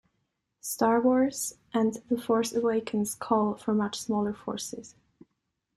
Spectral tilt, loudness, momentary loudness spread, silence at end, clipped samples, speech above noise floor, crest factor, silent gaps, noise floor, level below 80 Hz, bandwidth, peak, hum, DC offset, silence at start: -4.5 dB/octave; -28 LUFS; 11 LU; 0.9 s; under 0.1%; 53 dB; 18 dB; none; -80 dBFS; -66 dBFS; 13.5 kHz; -10 dBFS; none; under 0.1%; 0.65 s